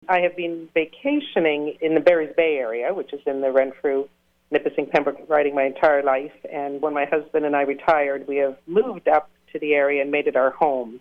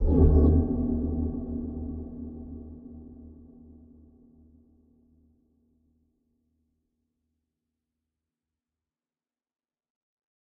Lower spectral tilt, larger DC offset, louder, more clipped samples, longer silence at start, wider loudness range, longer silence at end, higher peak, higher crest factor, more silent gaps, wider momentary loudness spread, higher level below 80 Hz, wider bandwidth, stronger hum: second, -7 dB/octave vs -14 dB/octave; neither; first, -22 LUFS vs -26 LUFS; neither; about the same, 0.1 s vs 0 s; second, 1 LU vs 26 LU; second, 0 s vs 7.25 s; about the same, -6 dBFS vs -8 dBFS; second, 16 dB vs 22 dB; neither; second, 8 LU vs 26 LU; second, -62 dBFS vs -34 dBFS; first, 5.8 kHz vs 1.7 kHz; neither